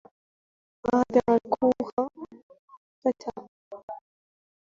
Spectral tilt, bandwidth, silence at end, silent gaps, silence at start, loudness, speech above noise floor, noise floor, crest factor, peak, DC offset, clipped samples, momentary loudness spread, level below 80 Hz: -7 dB/octave; 7.4 kHz; 0.75 s; 1.93-1.97 s, 2.43-2.49 s, 2.59-2.68 s, 2.77-3.02 s, 3.48-3.71 s, 3.83-3.88 s; 0.85 s; -26 LUFS; over 66 dB; under -90 dBFS; 22 dB; -8 dBFS; under 0.1%; under 0.1%; 22 LU; -62 dBFS